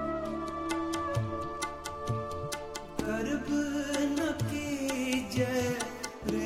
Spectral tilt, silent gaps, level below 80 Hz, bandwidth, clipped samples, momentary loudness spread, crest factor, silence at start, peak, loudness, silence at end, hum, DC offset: -5 dB/octave; none; -52 dBFS; 16 kHz; under 0.1%; 7 LU; 18 dB; 0 s; -14 dBFS; -33 LUFS; 0 s; none; under 0.1%